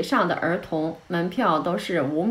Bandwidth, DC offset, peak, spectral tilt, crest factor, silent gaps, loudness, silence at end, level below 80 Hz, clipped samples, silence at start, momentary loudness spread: 15.5 kHz; under 0.1%; -8 dBFS; -6.5 dB/octave; 16 dB; none; -24 LUFS; 0 s; -60 dBFS; under 0.1%; 0 s; 6 LU